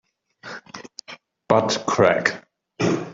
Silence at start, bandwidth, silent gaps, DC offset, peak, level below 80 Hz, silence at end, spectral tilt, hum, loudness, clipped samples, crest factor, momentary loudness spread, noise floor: 0.45 s; 7.8 kHz; none; under 0.1%; -2 dBFS; -62 dBFS; 0 s; -4.5 dB/octave; none; -20 LUFS; under 0.1%; 20 dB; 22 LU; -45 dBFS